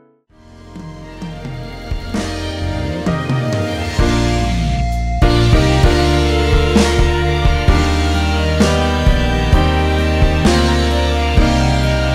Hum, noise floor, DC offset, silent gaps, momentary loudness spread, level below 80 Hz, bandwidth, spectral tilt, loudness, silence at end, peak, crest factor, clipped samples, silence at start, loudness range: none; -46 dBFS; under 0.1%; none; 14 LU; -18 dBFS; 13.5 kHz; -6 dB/octave; -15 LUFS; 0 s; 0 dBFS; 14 dB; under 0.1%; 0.55 s; 8 LU